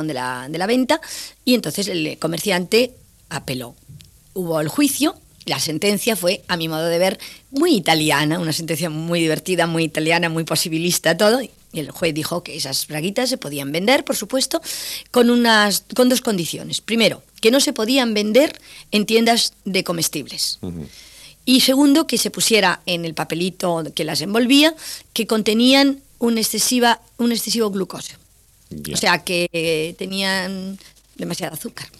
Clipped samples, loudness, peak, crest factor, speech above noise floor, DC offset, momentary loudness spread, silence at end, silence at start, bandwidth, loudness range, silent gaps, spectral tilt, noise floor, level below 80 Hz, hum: under 0.1%; -18 LUFS; -2 dBFS; 18 dB; 34 dB; under 0.1%; 13 LU; 0.15 s; 0 s; 16 kHz; 5 LU; none; -3.5 dB/octave; -53 dBFS; -56 dBFS; none